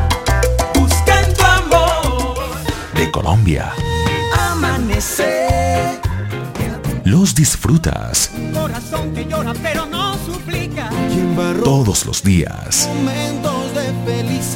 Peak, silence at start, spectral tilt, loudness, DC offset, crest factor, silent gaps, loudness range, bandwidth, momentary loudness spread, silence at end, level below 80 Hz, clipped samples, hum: 0 dBFS; 0 s; -4.5 dB/octave; -16 LUFS; under 0.1%; 16 dB; none; 4 LU; 17 kHz; 9 LU; 0 s; -24 dBFS; under 0.1%; none